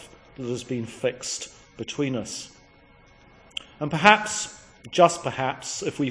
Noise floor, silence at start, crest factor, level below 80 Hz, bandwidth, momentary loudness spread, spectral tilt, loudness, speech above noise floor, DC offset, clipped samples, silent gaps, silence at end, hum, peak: -54 dBFS; 0 s; 26 dB; -60 dBFS; 10.5 kHz; 19 LU; -3.5 dB/octave; -24 LUFS; 30 dB; under 0.1%; under 0.1%; none; 0 s; none; 0 dBFS